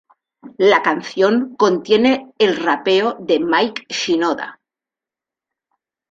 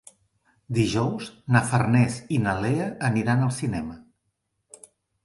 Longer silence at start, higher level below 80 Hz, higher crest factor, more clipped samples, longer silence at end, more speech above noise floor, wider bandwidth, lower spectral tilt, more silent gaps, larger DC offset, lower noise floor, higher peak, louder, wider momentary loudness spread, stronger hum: second, 0.45 s vs 0.7 s; second, -62 dBFS vs -52 dBFS; second, 16 dB vs 22 dB; neither; first, 1.6 s vs 1.25 s; first, 72 dB vs 53 dB; second, 7.8 kHz vs 11.5 kHz; second, -4 dB/octave vs -6.5 dB/octave; neither; neither; first, -88 dBFS vs -76 dBFS; about the same, -2 dBFS vs -2 dBFS; first, -17 LUFS vs -24 LUFS; about the same, 6 LU vs 8 LU; neither